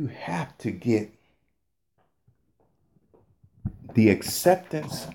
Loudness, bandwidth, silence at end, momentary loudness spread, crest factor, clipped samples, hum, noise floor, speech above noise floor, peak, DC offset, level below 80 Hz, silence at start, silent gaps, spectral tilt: -25 LUFS; 17 kHz; 0 s; 17 LU; 22 dB; under 0.1%; none; -79 dBFS; 54 dB; -6 dBFS; under 0.1%; -56 dBFS; 0 s; none; -5.5 dB/octave